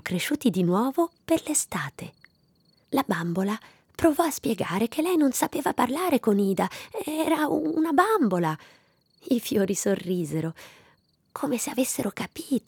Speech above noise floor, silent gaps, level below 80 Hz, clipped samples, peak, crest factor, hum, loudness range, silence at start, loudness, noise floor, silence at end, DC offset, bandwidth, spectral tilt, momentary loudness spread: 39 dB; none; -64 dBFS; under 0.1%; -8 dBFS; 18 dB; none; 4 LU; 0.05 s; -26 LUFS; -64 dBFS; 0.1 s; under 0.1%; over 20 kHz; -5 dB/octave; 11 LU